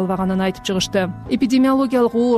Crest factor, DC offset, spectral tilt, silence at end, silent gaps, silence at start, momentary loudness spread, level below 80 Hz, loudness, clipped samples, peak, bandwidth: 10 dB; under 0.1%; -5.5 dB/octave; 0 s; none; 0 s; 6 LU; -46 dBFS; -18 LUFS; under 0.1%; -8 dBFS; 13.5 kHz